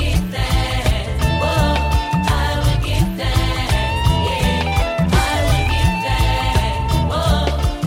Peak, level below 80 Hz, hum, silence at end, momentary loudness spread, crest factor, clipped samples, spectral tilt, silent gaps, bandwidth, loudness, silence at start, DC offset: -4 dBFS; -22 dBFS; none; 0 s; 3 LU; 14 dB; under 0.1%; -5.5 dB/octave; none; 16.5 kHz; -18 LUFS; 0 s; under 0.1%